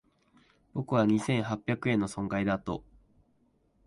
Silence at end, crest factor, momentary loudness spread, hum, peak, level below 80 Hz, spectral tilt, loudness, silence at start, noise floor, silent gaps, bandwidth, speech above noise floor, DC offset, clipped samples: 1.05 s; 18 dB; 12 LU; none; -14 dBFS; -58 dBFS; -6.5 dB/octave; -30 LUFS; 0.75 s; -70 dBFS; none; 11.5 kHz; 41 dB; under 0.1%; under 0.1%